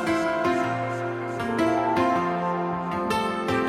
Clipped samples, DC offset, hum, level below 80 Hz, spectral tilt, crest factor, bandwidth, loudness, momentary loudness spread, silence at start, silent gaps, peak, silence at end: under 0.1%; under 0.1%; none; -56 dBFS; -6 dB/octave; 14 dB; 15 kHz; -25 LUFS; 6 LU; 0 s; none; -12 dBFS; 0 s